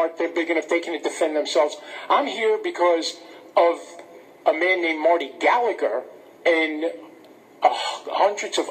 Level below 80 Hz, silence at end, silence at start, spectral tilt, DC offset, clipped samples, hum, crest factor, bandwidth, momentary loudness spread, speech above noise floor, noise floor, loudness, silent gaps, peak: -86 dBFS; 0 s; 0 s; -1.5 dB/octave; under 0.1%; under 0.1%; none; 20 dB; 15 kHz; 9 LU; 26 dB; -48 dBFS; -22 LUFS; none; -4 dBFS